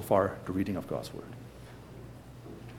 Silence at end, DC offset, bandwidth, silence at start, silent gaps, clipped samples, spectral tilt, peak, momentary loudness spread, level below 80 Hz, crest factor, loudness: 0 s; under 0.1%; 18.5 kHz; 0 s; none; under 0.1%; -7 dB/octave; -12 dBFS; 20 LU; -58 dBFS; 22 dB; -33 LUFS